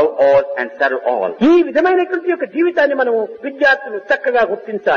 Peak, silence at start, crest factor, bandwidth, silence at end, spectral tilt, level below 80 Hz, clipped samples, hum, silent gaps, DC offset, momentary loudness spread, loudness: -4 dBFS; 0 s; 12 dB; 6.8 kHz; 0 s; -6 dB/octave; -56 dBFS; under 0.1%; none; none; under 0.1%; 7 LU; -15 LUFS